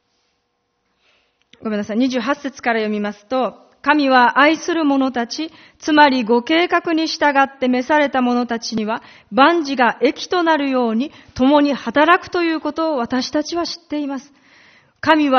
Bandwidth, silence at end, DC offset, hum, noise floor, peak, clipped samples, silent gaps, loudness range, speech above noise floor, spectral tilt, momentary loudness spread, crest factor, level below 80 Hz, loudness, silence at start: 6.6 kHz; 0 s; under 0.1%; none; -69 dBFS; 0 dBFS; under 0.1%; none; 5 LU; 52 dB; -2 dB/octave; 11 LU; 18 dB; -56 dBFS; -17 LUFS; 1.6 s